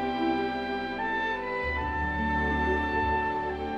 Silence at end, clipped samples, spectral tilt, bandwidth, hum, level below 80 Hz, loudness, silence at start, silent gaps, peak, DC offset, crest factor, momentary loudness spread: 0 s; under 0.1%; -7 dB/octave; 7.8 kHz; none; -40 dBFS; -29 LUFS; 0 s; none; -16 dBFS; under 0.1%; 14 dB; 4 LU